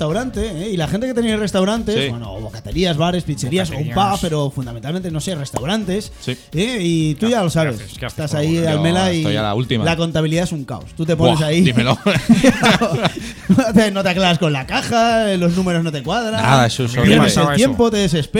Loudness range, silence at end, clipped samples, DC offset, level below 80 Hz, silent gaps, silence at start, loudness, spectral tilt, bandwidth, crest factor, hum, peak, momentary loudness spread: 5 LU; 0 s; under 0.1%; under 0.1%; -38 dBFS; none; 0 s; -17 LUFS; -5.5 dB/octave; 16.5 kHz; 16 dB; none; 0 dBFS; 10 LU